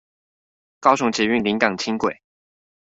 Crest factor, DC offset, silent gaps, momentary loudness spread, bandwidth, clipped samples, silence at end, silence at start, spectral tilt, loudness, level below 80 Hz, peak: 22 dB; under 0.1%; none; 6 LU; 8 kHz; under 0.1%; 0.75 s; 0.8 s; -4 dB/octave; -20 LUFS; -60 dBFS; -2 dBFS